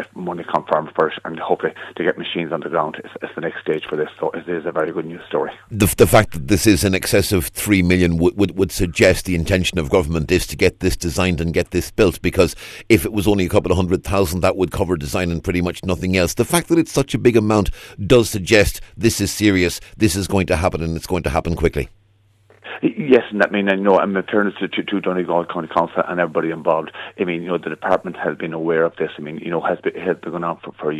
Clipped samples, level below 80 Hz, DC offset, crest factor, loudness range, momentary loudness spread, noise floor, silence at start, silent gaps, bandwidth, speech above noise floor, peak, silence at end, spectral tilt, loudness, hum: under 0.1%; -36 dBFS; under 0.1%; 18 dB; 6 LU; 10 LU; -56 dBFS; 0 s; none; 14 kHz; 38 dB; -2 dBFS; 0 s; -5 dB/octave; -19 LUFS; none